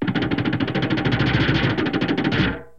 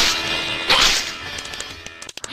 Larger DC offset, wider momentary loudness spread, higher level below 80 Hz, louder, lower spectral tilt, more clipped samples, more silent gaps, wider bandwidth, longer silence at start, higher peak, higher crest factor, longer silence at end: first, 0.5% vs under 0.1%; second, 3 LU vs 19 LU; about the same, -38 dBFS vs -40 dBFS; second, -21 LUFS vs -18 LUFS; first, -7.5 dB/octave vs -0.5 dB/octave; neither; neither; second, 7.2 kHz vs 16 kHz; about the same, 0 s vs 0 s; second, -6 dBFS vs -2 dBFS; about the same, 16 dB vs 20 dB; first, 0.15 s vs 0 s